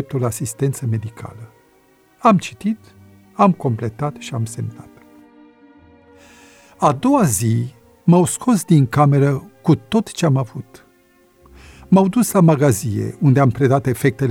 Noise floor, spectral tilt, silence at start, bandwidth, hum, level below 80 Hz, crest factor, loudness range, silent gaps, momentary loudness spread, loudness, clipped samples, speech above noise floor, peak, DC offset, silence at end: -54 dBFS; -6.5 dB/octave; 0 s; 16.5 kHz; none; -52 dBFS; 16 dB; 7 LU; none; 12 LU; -17 LUFS; under 0.1%; 38 dB; -2 dBFS; under 0.1%; 0 s